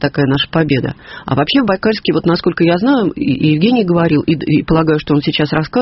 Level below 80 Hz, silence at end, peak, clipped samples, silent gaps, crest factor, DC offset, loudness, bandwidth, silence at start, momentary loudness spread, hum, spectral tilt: -40 dBFS; 0 s; 0 dBFS; under 0.1%; none; 12 dB; under 0.1%; -14 LUFS; 5.8 kHz; 0 s; 4 LU; none; -5 dB/octave